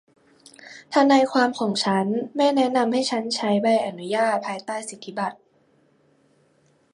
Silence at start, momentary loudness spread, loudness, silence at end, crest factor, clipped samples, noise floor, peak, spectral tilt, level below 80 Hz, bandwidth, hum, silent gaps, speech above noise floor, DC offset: 0.65 s; 13 LU; -22 LUFS; 1.6 s; 20 dB; under 0.1%; -62 dBFS; -4 dBFS; -4.5 dB/octave; -74 dBFS; 11.5 kHz; none; none; 40 dB; under 0.1%